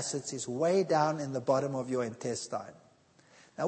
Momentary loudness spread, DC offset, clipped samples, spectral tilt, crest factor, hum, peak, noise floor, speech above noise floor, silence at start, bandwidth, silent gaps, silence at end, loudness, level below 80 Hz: 12 LU; under 0.1%; under 0.1%; -5 dB/octave; 18 dB; none; -14 dBFS; -63 dBFS; 32 dB; 0 s; 8.8 kHz; none; 0 s; -32 LUFS; -78 dBFS